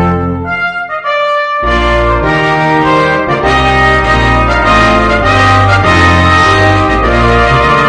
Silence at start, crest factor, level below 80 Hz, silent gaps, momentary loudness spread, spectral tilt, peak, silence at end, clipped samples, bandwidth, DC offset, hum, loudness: 0 s; 8 dB; -20 dBFS; none; 7 LU; -5.5 dB/octave; 0 dBFS; 0 s; 0.6%; 10 kHz; under 0.1%; none; -8 LUFS